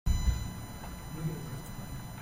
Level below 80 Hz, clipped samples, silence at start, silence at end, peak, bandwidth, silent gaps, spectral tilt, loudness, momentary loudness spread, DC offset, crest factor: -36 dBFS; under 0.1%; 0.05 s; 0 s; -16 dBFS; 16 kHz; none; -5.5 dB/octave; -38 LUFS; 11 LU; under 0.1%; 18 dB